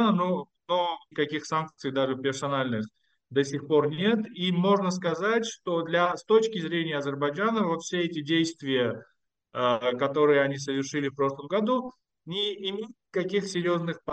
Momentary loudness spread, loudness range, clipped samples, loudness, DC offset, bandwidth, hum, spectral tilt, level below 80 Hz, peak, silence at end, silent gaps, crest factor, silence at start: 7 LU; 3 LU; under 0.1%; -27 LUFS; under 0.1%; 9 kHz; none; -5 dB/octave; -74 dBFS; -10 dBFS; 0 s; none; 18 dB; 0 s